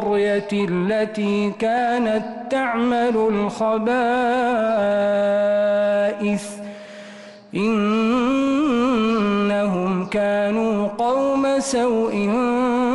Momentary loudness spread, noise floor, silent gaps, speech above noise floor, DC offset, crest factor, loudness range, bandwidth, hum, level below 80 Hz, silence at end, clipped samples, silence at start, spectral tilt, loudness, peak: 5 LU; -40 dBFS; none; 21 dB; under 0.1%; 8 dB; 2 LU; 12 kHz; none; -54 dBFS; 0 s; under 0.1%; 0 s; -6 dB/octave; -20 LUFS; -12 dBFS